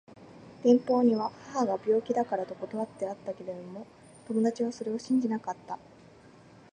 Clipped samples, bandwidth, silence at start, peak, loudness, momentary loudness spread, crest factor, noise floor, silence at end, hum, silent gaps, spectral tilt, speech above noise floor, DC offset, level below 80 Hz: under 0.1%; 9.6 kHz; 0.2 s; -10 dBFS; -30 LUFS; 18 LU; 20 dB; -54 dBFS; 0.95 s; none; none; -6.5 dB/octave; 26 dB; under 0.1%; -72 dBFS